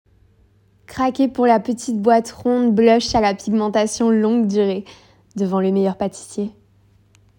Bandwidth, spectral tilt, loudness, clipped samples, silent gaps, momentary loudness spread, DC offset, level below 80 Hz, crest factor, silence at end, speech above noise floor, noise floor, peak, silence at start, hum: 16.5 kHz; -5.5 dB/octave; -18 LUFS; under 0.1%; none; 13 LU; under 0.1%; -50 dBFS; 16 dB; 0.9 s; 38 dB; -56 dBFS; -2 dBFS; 0.9 s; none